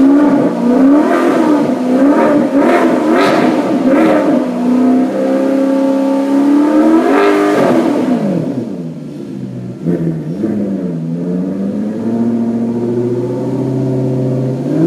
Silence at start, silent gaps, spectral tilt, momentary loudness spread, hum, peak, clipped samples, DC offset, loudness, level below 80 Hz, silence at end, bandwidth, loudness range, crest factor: 0 s; none; -7.5 dB/octave; 9 LU; none; 0 dBFS; under 0.1%; under 0.1%; -12 LUFS; -52 dBFS; 0 s; 13 kHz; 7 LU; 12 dB